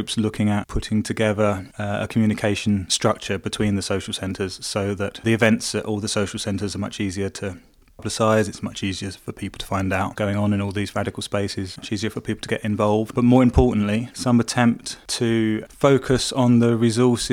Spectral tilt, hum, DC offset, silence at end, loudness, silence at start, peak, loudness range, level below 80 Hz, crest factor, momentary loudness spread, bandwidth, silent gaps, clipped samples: -5.5 dB/octave; none; under 0.1%; 0 s; -22 LUFS; 0 s; -2 dBFS; 5 LU; -40 dBFS; 20 dB; 10 LU; 15.5 kHz; none; under 0.1%